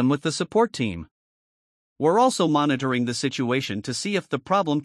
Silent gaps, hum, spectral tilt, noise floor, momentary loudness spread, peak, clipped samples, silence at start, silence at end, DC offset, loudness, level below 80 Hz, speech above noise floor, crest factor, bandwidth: 1.11-1.96 s; none; -5 dB/octave; under -90 dBFS; 8 LU; -8 dBFS; under 0.1%; 0 s; 0 s; under 0.1%; -23 LUFS; -62 dBFS; over 67 dB; 16 dB; 12 kHz